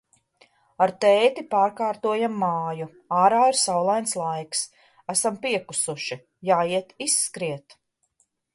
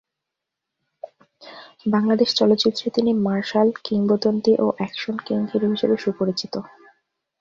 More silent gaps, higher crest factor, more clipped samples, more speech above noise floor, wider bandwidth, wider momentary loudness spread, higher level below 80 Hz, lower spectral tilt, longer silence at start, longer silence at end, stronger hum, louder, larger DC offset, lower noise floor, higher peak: neither; about the same, 18 dB vs 16 dB; neither; second, 47 dB vs 63 dB; first, 12 kHz vs 7.4 kHz; second, 13 LU vs 18 LU; second, -74 dBFS vs -64 dBFS; second, -3 dB/octave vs -6 dB/octave; second, 0.8 s vs 1.05 s; first, 0.95 s vs 0.75 s; neither; about the same, -23 LUFS vs -21 LUFS; neither; second, -70 dBFS vs -83 dBFS; about the same, -6 dBFS vs -6 dBFS